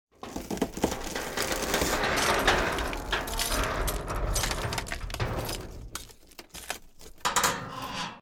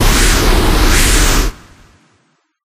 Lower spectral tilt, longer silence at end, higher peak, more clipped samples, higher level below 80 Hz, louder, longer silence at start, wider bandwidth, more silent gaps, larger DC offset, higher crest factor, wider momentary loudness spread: about the same, -3 dB/octave vs -3 dB/octave; second, 0 s vs 1.2 s; second, -10 dBFS vs 0 dBFS; neither; second, -38 dBFS vs -14 dBFS; second, -29 LUFS vs -12 LUFS; first, 0.25 s vs 0 s; about the same, 17.5 kHz vs 16 kHz; neither; neither; first, 22 dB vs 12 dB; first, 16 LU vs 5 LU